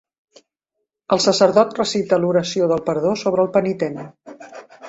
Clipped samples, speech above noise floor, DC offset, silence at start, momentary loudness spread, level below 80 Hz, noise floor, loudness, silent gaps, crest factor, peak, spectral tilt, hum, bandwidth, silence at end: under 0.1%; 61 dB; under 0.1%; 1.1 s; 21 LU; -60 dBFS; -78 dBFS; -18 LUFS; none; 18 dB; -2 dBFS; -5 dB/octave; none; 8.2 kHz; 0 s